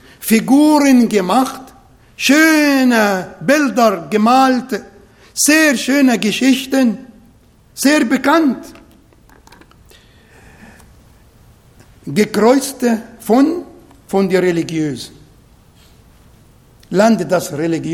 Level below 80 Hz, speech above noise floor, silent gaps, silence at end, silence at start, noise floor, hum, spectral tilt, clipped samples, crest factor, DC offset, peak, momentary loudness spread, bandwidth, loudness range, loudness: -52 dBFS; 35 dB; none; 0 s; 0.2 s; -48 dBFS; none; -4 dB/octave; under 0.1%; 16 dB; under 0.1%; 0 dBFS; 12 LU; 17.5 kHz; 7 LU; -13 LUFS